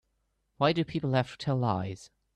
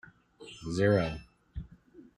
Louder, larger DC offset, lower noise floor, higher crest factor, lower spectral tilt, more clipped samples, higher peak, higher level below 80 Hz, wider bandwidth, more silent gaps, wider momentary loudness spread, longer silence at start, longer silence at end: about the same, -30 LUFS vs -29 LUFS; neither; first, -77 dBFS vs -56 dBFS; about the same, 20 dB vs 18 dB; about the same, -7 dB/octave vs -7 dB/octave; neither; about the same, -12 dBFS vs -14 dBFS; second, -62 dBFS vs -52 dBFS; second, 9.8 kHz vs 11 kHz; neither; second, 9 LU vs 23 LU; first, 0.6 s vs 0.4 s; first, 0.3 s vs 0.15 s